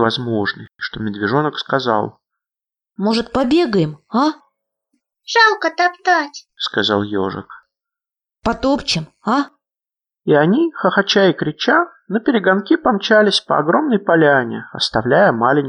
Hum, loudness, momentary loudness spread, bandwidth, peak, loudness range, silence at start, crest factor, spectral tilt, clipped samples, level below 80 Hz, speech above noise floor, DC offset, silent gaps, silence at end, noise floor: none; -16 LUFS; 11 LU; 10.5 kHz; -2 dBFS; 6 LU; 0 s; 16 dB; -5 dB/octave; under 0.1%; -50 dBFS; 74 dB; under 0.1%; none; 0 s; -90 dBFS